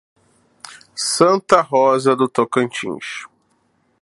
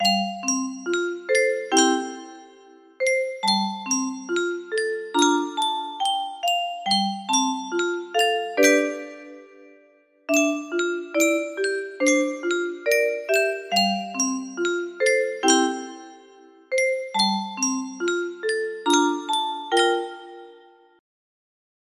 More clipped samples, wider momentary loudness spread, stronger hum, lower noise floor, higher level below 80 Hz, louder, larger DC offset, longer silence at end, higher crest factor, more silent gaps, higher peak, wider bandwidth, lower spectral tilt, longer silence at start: neither; first, 18 LU vs 7 LU; neither; first, -63 dBFS vs -57 dBFS; first, -66 dBFS vs -72 dBFS; first, -17 LUFS vs -23 LUFS; neither; second, 0.75 s vs 1.4 s; about the same, 18 dB vs 20 dB; neither; first, 0 dBFS vs -4 dBFS; second, 11.5 kHz vs 15.5 kHz; first, -4 dB/octave vs -2.5 dB/octave; first, 0.65 s vs 0 s